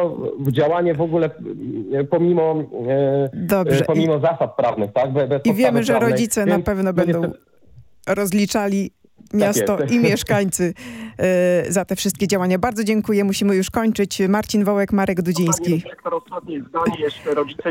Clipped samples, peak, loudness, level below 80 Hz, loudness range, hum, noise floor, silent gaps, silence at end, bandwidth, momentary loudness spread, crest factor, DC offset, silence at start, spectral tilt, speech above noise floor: under 0.1%; -2 dBFS; -19 LUFS; -50 dBFS; 2 LU; none; -49 dBFS; none; 0 s; 17 kHz; 7 LU; 16 dB; under 0.1%; 0 s; -5.5 dB/octave; 31 dB